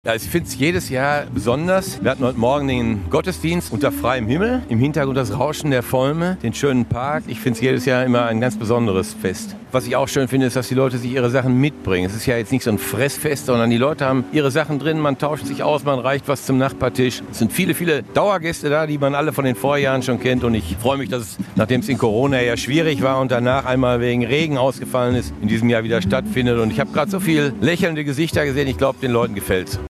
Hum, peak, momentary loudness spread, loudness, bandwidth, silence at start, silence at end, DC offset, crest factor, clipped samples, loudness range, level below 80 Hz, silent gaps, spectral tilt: none; -2 dBFS; 4 LU; -19 LUFS; 14.5 kHz; 0.05 s; 0.05 s; under 0.1%; 16 dB; under 0.1%; 1 LU; -42 dBFS; none; -6 dB/octave